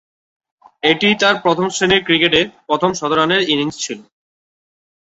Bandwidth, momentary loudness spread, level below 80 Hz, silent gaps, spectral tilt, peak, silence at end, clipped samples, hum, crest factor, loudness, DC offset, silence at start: 8.2 kHz; 8 LU; -52 dBFS; none; -3.5 dB/octave; 0 dBFS; 1 s; under 0.1%; none; 18 dB; -15 LUFS; under 0.1%; 0.85 s